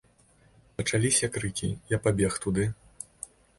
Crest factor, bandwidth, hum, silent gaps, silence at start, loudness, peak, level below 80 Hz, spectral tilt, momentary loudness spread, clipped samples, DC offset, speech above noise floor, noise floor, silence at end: 20 dB; 11.5 kHz; none; none; 0.8 s; -28 LUFS; -10 dBFS; -50 dBFS; -4.5 dB/octave; 19 LU; under 0.1%; under 0.1%; 34 dB; -61 dBFS; 0.55 s